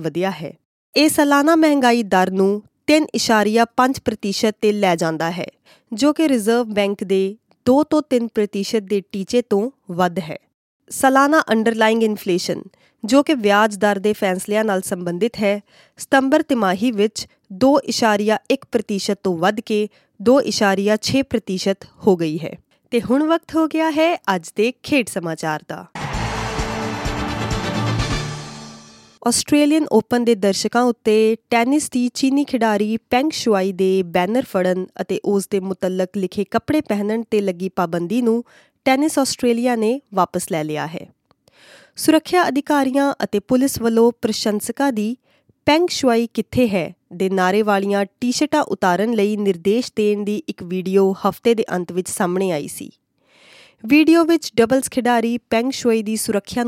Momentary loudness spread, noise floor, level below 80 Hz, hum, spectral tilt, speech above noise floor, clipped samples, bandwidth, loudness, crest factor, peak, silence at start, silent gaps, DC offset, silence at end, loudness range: 9 LU; -54 dBFS; -46 dBFS; none; -4.5 dB/octave; 36 dB; under 0.1%; 16.5 kHz; -18 LUFS; 18 dB; -2 dBFS; 0 s; 0.65-0.93 s, 10.54-10.80 s; under 0.1%; 0 s; 4 LU